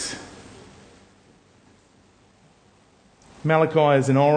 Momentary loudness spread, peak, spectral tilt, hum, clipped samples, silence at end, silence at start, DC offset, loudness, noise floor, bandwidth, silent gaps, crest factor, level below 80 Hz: 26 LU; -4 dBFS; -6 dB/octave; none; under 0.1%; 0 s; 0 s; under 0.1%; -20 LUFS; -57 dBFS; 9.8 kHz; none; 20 dB; -62 dBFS